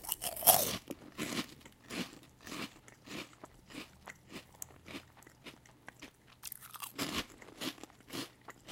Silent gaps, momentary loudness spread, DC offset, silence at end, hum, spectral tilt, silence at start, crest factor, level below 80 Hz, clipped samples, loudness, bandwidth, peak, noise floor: none; 24 LU; under 0.1%; 0 s; none; -2 dB/octave; 0 s; 36 dB; -66 dBFS; under 0.1%; -36 LUFS; 17 kHz; -4 dBFS; -57 dBFS